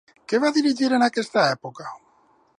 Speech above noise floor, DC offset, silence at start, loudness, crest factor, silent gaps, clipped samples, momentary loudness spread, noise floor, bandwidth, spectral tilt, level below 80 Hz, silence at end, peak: 39 dB; under 0.1%; 0.3 s; -21 LUFS; 16 dB; none; under 0.1%; 17 LU; -60 dBFS; 11 kHz; -4.5 dB/octave; -76 dBFS; 0.6 s; -6 dBFS